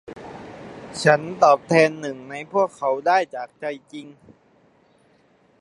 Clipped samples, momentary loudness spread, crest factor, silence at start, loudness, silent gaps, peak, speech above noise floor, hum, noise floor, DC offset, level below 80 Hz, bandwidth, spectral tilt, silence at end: under 0.1%; 22 LU; 22 dB; 0.1 s; -20 LUFS; none; 0 dBFS; 38 dB; none; -59 dBFS; under 0.1%; -64 dBFS; 11.5 kHz; -5 dB/octave; 1.55 s